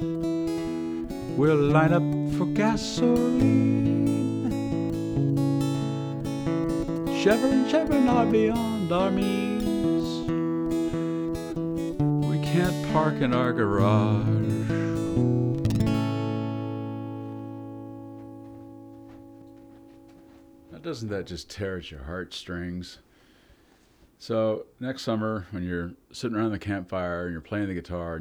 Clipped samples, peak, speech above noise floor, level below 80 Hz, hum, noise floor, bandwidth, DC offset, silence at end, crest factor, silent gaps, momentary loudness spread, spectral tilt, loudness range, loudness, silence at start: under 0.1%; -8 dBFS; 35 dB; -48 dBFS; none; -59 dBFS; over 20 kHz; under 0.1%; 0 s; 18 dB; none; 15 LU; -7 dB/octave; 14 LU; -26 LUFS; 0 s